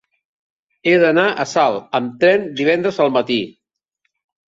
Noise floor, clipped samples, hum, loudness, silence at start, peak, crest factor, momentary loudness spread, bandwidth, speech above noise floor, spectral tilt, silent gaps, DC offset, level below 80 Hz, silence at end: -72 dBFS; under 0.1%; none; -16 LUFS; 0.85 s; -2 dBFS; 16 dB; 8 LU; 7.8 kHz; 57 dB; -5 dB/octave; none; under 0.1%; -64 dBFS; 1 s